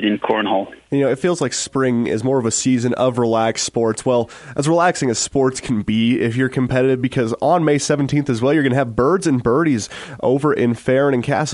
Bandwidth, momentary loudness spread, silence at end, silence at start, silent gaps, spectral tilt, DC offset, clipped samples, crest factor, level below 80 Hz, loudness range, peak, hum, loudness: 11.5 kHz; 4 LU; 0 s; 0 s; none; -5 dB/octave; under 0.1%; under 0.1%; 14 dB; -48 dBFS; 1 LU; -2 dBFS; none; -18 LUFS